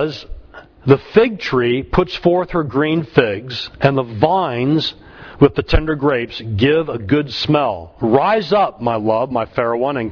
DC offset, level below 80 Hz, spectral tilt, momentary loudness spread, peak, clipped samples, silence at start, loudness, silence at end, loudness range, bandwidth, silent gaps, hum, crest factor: under 0.1%; -32 dBFS; -7.5 dB/octave; 7 LU; 0 dBFS; under 0.1%; 0 s; -17 LUFS; 0 s; 1 LU; 5.4 kHz; none; none; 16 dB